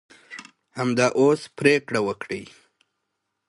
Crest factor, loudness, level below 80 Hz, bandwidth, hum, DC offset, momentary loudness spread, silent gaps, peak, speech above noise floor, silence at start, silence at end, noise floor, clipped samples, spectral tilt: 20 dB; -22 LUFS; -64 dBFS; 11.5 kHz; none; under 0.1%; 22 LU; none; -4 dBFS; 57 dB; 0.3 s; 1.05 s; -79 dBFS; under 0.1%; -5 dB/octave